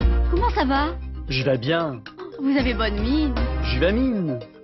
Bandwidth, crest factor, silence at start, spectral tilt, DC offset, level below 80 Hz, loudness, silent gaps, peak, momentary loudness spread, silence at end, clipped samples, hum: 6 kHz; 16 dB; 0 s; -8 dB/octave; under 0.1%; -26 dBFS; -23 LUFS; none; -6 dBFS; 8 LU; 0 s; under 0.1%; none